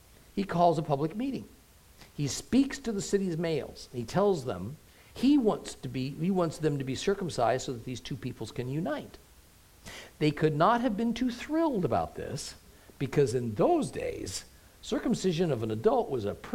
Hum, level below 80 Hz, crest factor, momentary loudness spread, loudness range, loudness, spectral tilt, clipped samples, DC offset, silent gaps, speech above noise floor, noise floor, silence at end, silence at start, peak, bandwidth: none; -56 dBFS; 20 dB; 13 LU; 3 LU; -30 LUFS; -6 dB/octave; under 0.1%; under 0.1%; none; 28 dB; -57 dBFS; 0 s; 0.35 s; -10 dBFS; 16.5 kHz